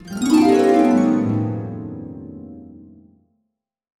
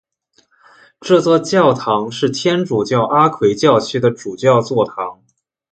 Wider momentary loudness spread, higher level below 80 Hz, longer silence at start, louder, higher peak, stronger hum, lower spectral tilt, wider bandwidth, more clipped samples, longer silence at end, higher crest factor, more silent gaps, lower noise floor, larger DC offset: first, 22 LU vs 6 LU; about the same, -56 dBFS vs -58 dBFS; second, 0.05 s vs 1 s; about the same, -17 LUFS vs -15 LUFS; second, -4 dBFS vs 0 dBFS; neither; first, -7 dB/octave vs -5.5 dB/octave; first, 13.5 kHz vs 9.2 kHz; neither; first, 1.3 s vs 0.6 s; about the same, 16 dB vs 16 dB; neither; first, -76 dBFS vs -63 dBFS; neither